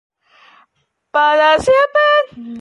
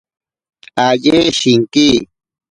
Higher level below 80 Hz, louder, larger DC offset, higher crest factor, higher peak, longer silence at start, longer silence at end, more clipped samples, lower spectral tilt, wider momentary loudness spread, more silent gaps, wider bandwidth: second, -50 dBFS vs -44 dBFS; about the same, -13 LUFS vs -12 LUFS; neither; about the same, 12 dB vs 14 dB; second, -4 dBFS vs 0 dBFS; first, 1.15 s vs 0.75 s; second, 0 s vs 0.45 s; neither; about the same, -3 dB/octave vs -4 dB/octave; about the same, 8 LU vs 6 LU; neither; about the same, 11.5 kHz vs 11 kHz